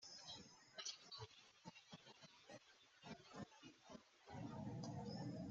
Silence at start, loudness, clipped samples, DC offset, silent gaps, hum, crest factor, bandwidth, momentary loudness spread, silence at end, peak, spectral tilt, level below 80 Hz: 0 s; -56 LUFS; under 0.1%; under 0.1%; none; none; 20 dB; 8 kHz; 12 LU; 0 s; -36 dBFS; -4.5 dB/octave; -82 dBFS